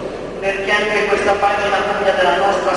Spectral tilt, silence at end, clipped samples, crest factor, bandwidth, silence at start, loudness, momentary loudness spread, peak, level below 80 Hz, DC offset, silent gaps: -3.5 dB/octave; 0 s; under 0.1%; 14 dB; 11.5 kHz; 0 s; -16 LUFS; 6 LU; -2 dBFS; -42 dBFS; under 0.1%; none